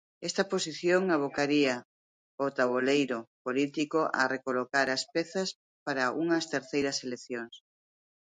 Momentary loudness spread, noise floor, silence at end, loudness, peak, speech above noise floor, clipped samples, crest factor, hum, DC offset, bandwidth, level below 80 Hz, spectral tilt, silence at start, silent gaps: 10 LU; under -90 dBFS; 0.7 s; -30 LUFS; -10 dBFS; over 60 dB; under 0.1%; 20 dB; none; under 0.1%; 9.6 kHz; -76 dBFS; -4 dB/octave; 0.2 s; 1.85-2.38 s, 3.27-3.45 s, 5.55-5.86 s